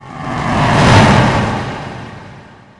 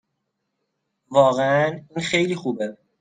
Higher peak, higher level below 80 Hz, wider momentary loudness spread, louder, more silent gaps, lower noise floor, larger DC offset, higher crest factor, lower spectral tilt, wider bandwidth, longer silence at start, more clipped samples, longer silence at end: first, 0 dBFS vs -4 dBFS; first, -30 dBFS vs -64 dBFS; first, 20 LU vs 11 LU; first, -11 LUFS vs -21 LUFS; neither; second, -37 dBFS vs -77 dBFS; neither; second, 14 dB vs 20 dB; about the same, -6 dB/octave vs -5 dB/octave; first, 11 kHz vs 9.4 kHz; second, 0.05 s vs 1.1 s; neither; first, 0.4 s vs 0.25 s